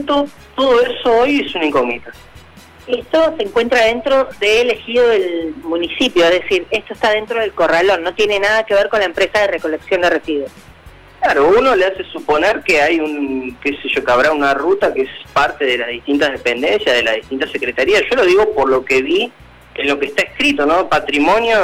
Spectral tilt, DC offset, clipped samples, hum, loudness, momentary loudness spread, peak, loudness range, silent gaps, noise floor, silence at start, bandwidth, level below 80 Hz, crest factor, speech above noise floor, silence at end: -3.5 dB/octave; under 0.1%; under 0.1%; none; -15 LUFS; 8 LU; -6 dBFS; 2 LU; none; -41 dBFS; 0 s; 16 kHz; -44 dBFS; 10 dB; 26 dB; 0 s